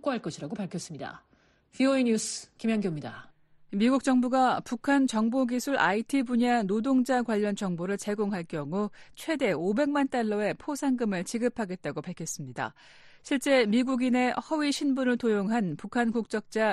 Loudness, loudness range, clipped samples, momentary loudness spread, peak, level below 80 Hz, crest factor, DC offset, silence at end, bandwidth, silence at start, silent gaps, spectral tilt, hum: -28 LUFS; 5 LU; under 0.1%; 11 LU; -12 dBFS; -66 dBFS; 16 dB; under 0.1%; 0 s; 12.5 kHz; 0.05 s; none; -5 dB/octave; none